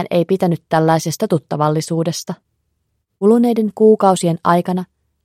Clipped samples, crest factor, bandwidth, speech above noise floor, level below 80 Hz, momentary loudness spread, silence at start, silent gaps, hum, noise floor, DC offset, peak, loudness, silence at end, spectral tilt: under 0.1%; 16 dB; 16 kHz; 54 dB; -62 dBFS; 11 LU; 0 s; none; none; -69 dBFS; under 0.1%; 0 dBFS; -16 LUFS; 0.4 s; -6.5 dB/octave